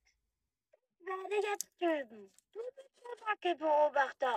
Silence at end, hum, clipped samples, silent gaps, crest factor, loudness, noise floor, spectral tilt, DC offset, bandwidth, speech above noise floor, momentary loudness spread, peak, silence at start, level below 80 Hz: 0 s; none; under 0.1%; none; 24 dB; -34 LUFS; -88 dBFS; -1.5 dB/octave; under 0.1%; 15 kHz; 53 dB; 20 LU; -14 dBFS; 1.05 s; -90 dBFS